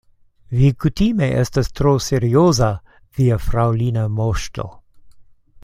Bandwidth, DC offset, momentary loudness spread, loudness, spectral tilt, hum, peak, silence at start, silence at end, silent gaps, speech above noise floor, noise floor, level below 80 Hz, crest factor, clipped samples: 15 kHz; under 0.1%; 13 LU; -18 LUFS; -6.5 dB/octave; none; -2 dBFS; 0.5 s; 0.05 s; none; 28 dB; -45 dBFS; -32 dBFS; 16 dB; under 0.1%